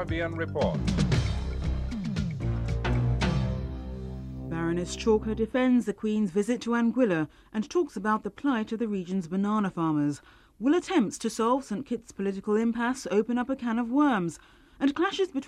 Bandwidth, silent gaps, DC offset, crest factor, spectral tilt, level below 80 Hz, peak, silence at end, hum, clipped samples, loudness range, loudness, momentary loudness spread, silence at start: 12.5 kHz; none; under 0.1%; 16 dB; -6.5 dB/octave; -40 dBFS; -12 dBFS; 0 s; none; under 0.1%; 2 LU; -28 LUFS; 9 LU; 0 s